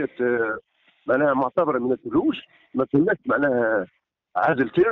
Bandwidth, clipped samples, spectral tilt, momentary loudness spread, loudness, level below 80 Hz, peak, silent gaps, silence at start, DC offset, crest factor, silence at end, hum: 4.2 kHz; under 0.1%; -5.5 dB/octave; 11 LU; -23 LUFS; -58 dBFS; -8 dBFS; none; 0 s; under 0.1%; 14 dB; 0 s; none